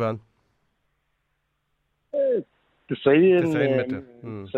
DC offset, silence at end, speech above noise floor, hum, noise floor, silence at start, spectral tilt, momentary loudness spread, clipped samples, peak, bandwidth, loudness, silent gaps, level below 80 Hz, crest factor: under 0.1%; 0 s; 52 dB; none; -74 dBFS; 0 s; -8 dB/octave; 19 LU; under 0.1%; -4 dBFS; 8 kHz; -22 LUFS; none; -66 dBFS; 20 dB